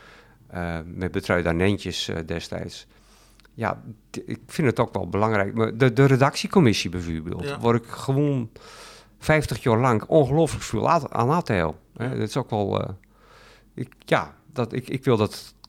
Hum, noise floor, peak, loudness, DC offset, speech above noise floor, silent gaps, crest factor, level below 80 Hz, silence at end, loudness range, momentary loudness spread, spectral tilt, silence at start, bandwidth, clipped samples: none; -54 dBFS; -6 dBFS; -23 LUFS; under 0.1%; 31 dB; none; 18 dB; -50 dBFS; 0.2 s; 7 LU; 16 LU; -6 dB/octave; 0.5 s; 16 kHz; under 0.1%